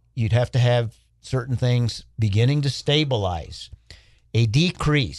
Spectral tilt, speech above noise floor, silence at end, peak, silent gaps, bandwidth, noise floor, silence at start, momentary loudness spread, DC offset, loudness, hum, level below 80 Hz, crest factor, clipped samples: -6 dB/octave; 28 dB; 0 s; -6 dBFS; none; 11 kHz; -49 dBFS; 0.15 s; 11 LU; under 0.1%; -22 LUFS; none; -44 dBFS; 16 dB; under 0.1%